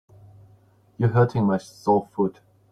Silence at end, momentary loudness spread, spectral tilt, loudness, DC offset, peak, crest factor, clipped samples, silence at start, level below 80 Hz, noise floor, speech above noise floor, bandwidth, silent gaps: 0.4 s; 7 LU; -8.5 dB/octave; -23 LUFS; under 0.1%; -6 dBFS; 18 dB; under 0.1%; 1 s; -60 dBFS; -57 dBFS; 35 dB; 9.8 kHz; none